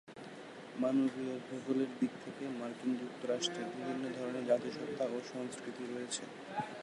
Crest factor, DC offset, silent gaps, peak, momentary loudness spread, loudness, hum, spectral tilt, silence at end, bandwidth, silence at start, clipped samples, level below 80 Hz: 20 dB; under 0.1%; none; -18 dBFS; 9 LU; -38 LUFS; none; -4.5 dB/octave; 0 s; 11.5 kHz; 0.05 s; under 0.1%; -84 dBFS